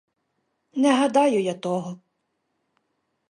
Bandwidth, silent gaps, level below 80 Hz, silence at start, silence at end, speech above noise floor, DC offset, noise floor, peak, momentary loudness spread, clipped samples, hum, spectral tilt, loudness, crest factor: 11 kHz; none; -78 dBFS; 0.75 s; 1.35 s; 54 dB; under 0.1%; -75 dBFS; -6 dBFS; 14 LU; under 0.1%; none; -5 dB/octave; -22 LUFS; 20 dB